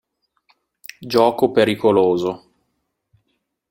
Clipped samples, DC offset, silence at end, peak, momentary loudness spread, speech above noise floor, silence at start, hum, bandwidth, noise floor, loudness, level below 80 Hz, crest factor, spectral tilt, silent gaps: under 0.1%; under 0.1%; 1.35 s; -2 dBFS; 22 LU; 56 dB; 1 s; none; 16.5 kHz; -73 dBFS; -17 LUFS; -60 dBFS; 20 dB; -6 dB/octave; none